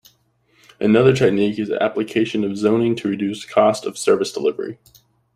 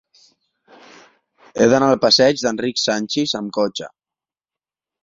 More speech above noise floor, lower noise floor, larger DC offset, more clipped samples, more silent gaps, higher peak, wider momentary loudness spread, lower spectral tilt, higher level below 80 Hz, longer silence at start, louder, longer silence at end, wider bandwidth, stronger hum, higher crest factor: second, 43 dB vs over 73 dB; second, -61 dBFS vs under -90 dBFS; neither; neither; neither; about the same, 0 dBFS vs -2 dBFS; second, 8 LU vs 13 LU; first, -6 dB/octave vs -3.5 dB/octave; about the same, -58 dBFS vs -60 dBFS; second, 0.8 s vs 1.55 s; about the same, -19 LUFS vs -17 LUFS; second, 0.6 s vs 1.15 s; first, 15 kHz vs 7.8 kHz; neither; about the same, 18 dB vs 18 dB